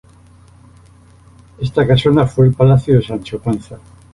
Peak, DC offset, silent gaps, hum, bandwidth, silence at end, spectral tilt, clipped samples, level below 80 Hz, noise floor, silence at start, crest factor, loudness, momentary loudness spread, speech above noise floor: -2 dBFS; under 0.1%; none; none; 11 kHz; 0.4 s; -8.5 dB/octave; under 0.1%; -40 dBFS; -45 dBFS; 1.6 s; 14 dB; -14 LUFS; 13 LU; 31 dB